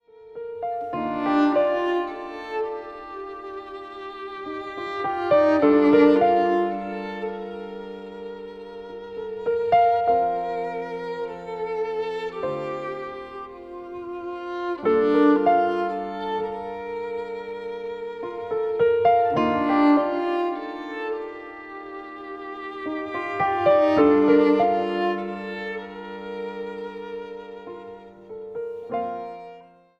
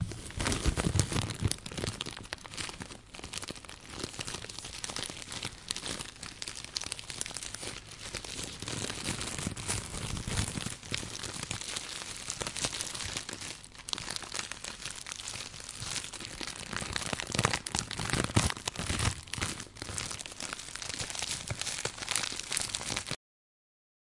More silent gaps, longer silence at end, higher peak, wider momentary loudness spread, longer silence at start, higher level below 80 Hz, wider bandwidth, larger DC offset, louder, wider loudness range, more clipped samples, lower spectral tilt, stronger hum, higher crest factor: neither; second, 0.35 s vs 1 s; about the same, -4 dBFS vs -4 dBFS; first, 19 LU vs 9 LU; first, 0.2 s vs 0 s; second, -60 dBFS vs -48 dBFS; second, 6.4 kHz vs 11.5 kHz; neither; first, -23 LUFS vs -35 LUFS; first, 10 LU vs 6 LU; neither; first, -7.5 dB/octave vs -2.5 dB/octave; neither; second, 20 dB vs 34 dB